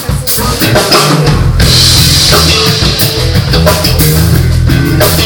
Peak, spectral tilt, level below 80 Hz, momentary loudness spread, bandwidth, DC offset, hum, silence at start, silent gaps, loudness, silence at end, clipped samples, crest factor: 0 dBFS; -4 dB/octave; -16 dBFS; 5 LU; over 20 kHz; under 0.1%; none; 0 s; none; -6 LUFS; 0 s; 2%; 8 dB